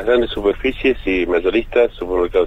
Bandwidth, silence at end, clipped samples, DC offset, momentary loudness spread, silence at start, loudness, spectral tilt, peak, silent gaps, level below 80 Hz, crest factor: 8 kHz; 0 s; under 0.1%; under 0.1%; 3 LU; 0 s; -18 LUFS; -6.5 dB/octave; -2 dBFS; none; -32 dBFS; 14 dB